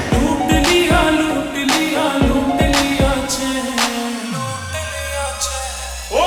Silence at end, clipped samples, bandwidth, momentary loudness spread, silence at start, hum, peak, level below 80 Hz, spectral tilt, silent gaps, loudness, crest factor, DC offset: 0 s; under 0.1%; over 20 kHz; 10 LU; 0 s; none; -2 dBFS; -28 dBFS; -4 dB/octave; none; -17 LUFS; 16 dB; under 0.1%